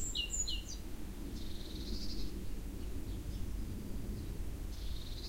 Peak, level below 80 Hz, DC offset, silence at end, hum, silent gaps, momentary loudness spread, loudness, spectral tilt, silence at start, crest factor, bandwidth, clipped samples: -24 dBFS; -42 dBFS; under 0.1%; 0 s; none; none; 10 LU; -43 LUFS; -3.5 dB/octave; 0 s; 14 dB; 16 kHz; under 0.1%